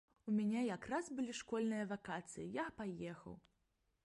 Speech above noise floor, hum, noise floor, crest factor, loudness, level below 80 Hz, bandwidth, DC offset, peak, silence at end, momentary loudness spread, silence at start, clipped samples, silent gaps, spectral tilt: 41 dB; none; -83 dBFS; 16 dB; -43 LUFS; -74 dBFS; 11.5 kHz; under 0.1%; -28 dBFS; 0.65 s; 11 LU; 0.25 s; under 0.1%; none; -5.5 dB/octave